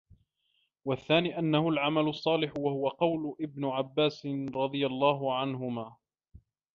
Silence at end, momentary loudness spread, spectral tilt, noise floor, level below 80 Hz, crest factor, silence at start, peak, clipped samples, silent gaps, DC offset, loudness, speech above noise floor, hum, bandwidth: 0.35 s; 9 LU; -7.5 dB/octave; -76 dBFS; -68 dBFS; 20 dB; 0.85 s; -12 dBFS; under 0.1%; none; under 0.1%; -30 LUFS; 46 dB; none; 7 kHz